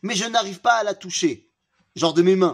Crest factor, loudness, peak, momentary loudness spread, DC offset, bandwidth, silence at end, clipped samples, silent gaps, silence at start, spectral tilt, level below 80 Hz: 18 dB; -21 LUFS; -4 dBFS; 9 LU; under 0.1%; 11 kHz; 0 s; under 0.1%; none; 0.05 s; -4 dB/octave; -72 dBFS